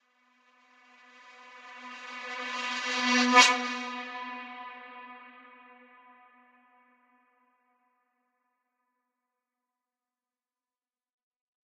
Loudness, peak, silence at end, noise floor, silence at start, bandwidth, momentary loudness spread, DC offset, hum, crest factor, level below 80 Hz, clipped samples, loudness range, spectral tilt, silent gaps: -26 LUFS; -4 dBFS; 6.25 s; under -90 dBFS; 1.25 s; 13 kHz; 28 LU; under 0.1%; none; 30 dB; under -90 dBFS; under 0.1%; 19 LU; 0.5 dB/octave; none